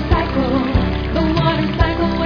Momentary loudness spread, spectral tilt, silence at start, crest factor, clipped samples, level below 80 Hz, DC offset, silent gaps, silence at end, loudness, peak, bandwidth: 2 LU; -8 dB/octave; 0 s; 16 dB; under 0.1%; -24 dBFS; under 0.1%; none; 0 s; -17 LUFS; 0 dBFS; 5.4 kHz